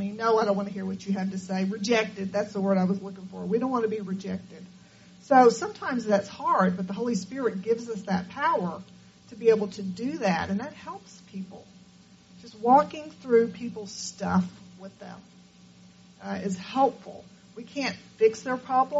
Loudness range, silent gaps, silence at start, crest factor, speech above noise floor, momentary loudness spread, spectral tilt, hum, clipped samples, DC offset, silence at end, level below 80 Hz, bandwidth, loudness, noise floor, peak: 6 LU; none; 0 s; 22 dB; 28 dB; 20 LU; -5 dB/octave; none; under 0.1%; under 0.1%; 0 s; -68 dBFS; 8 kHz; -27 LUFS; -54 dBFS; -4 dBFS